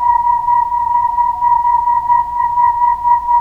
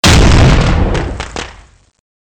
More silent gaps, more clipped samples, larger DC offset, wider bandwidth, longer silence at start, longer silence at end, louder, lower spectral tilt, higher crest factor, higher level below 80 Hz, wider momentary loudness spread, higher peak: neither; neither; neither; second, 3.1 kHz vs 19 kHz; about the same, 0 s vs 0.05 s; second, 0 s vs 0.85 s; second, -13 LUFS vs -10 LUFS; about the same, -5 dB/octave vs -5 dB/octave; about the same, 10 dB vs 8 dB; second, -40 dBFS vs -14 dBFS; second, 2 LU vs 17 LU; about the same, -2 dBFS vs -4 dBFS